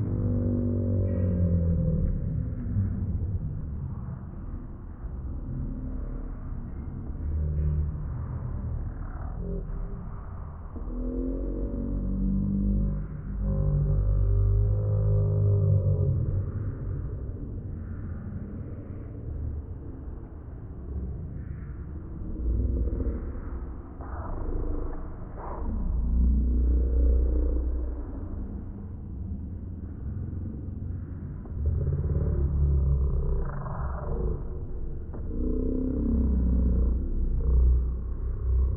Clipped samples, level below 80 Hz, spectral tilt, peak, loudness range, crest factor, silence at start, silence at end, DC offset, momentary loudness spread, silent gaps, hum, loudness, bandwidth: under 0.1%; -30 dBFS; -14.5 dB/octave; -12 dBFS; 10 LU; 14 dB; 0 s; 0 s; under 0.1%; 13 LU; none; none; -30 LUFS; 2 kHz